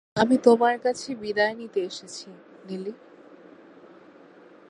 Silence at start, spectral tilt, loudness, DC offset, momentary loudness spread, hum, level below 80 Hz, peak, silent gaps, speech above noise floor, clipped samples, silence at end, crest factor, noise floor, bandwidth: 0.15 s; -4.5 dB/octave; -24 LUFS; under 0.1%; 20 LU; none; -68 dBFS; -4 dBFS; none; 27 dB; under 0.1%; 1.75 s; 24 dB; -51 dBFS; 11 kHz